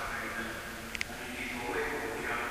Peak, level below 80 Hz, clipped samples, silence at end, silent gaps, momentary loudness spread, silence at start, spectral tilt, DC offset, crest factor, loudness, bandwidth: -14 dBFS; -52 dBFS; under 0.1%; 0 s; none; 5 LU; 0 s; -3 dB/octave; under 0.1%; 24 dB; -36 LUFS; 16 kHz